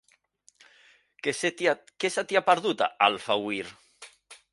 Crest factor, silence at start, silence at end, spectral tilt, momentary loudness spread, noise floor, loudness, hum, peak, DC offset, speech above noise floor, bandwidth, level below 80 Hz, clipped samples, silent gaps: 24 dB; 1.25 s; 0.2 s; -3 dB/octave; 10 LU; -64 dBFS; -26 LUFS; none; -6 dBFS; under 0.1%; 37 dB; 11.5 kHz; -74 dBFS; under 0.1%; none